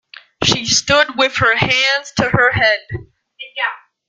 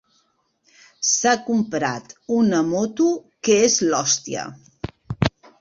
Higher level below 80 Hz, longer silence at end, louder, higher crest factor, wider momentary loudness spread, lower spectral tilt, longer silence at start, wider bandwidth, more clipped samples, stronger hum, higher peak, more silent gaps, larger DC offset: first, -44 dBFS vs -50 dBFS; about the same, 0.3 s vs 0.3 s; first, -14 LUFS vs -20 LUFS; about the same, 16 dB vs 20 dB; about the same, 14 LU vs 16 LU; about the same, -2.5 dB/octave vs -3.5 dB/octave; second, 0.4 s vs 1 s; first, 10.5 kHz vs 7.8 kHz; neither; neither; about the same, 0 dBFS vs -2 dBFS; neither; neither